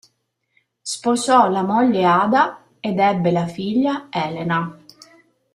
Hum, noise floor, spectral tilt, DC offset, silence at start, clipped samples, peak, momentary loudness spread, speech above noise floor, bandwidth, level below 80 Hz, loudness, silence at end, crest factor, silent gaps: none; -70 dBFS; -5.5 dB/octave; under 0.1%; 0.85 s; under 0.1%; -2 dBFS; 10 LU; 52 dB; 12.5 kHz; -62 dBFS; -19 LUFS; 0.8 s; 18 dB; none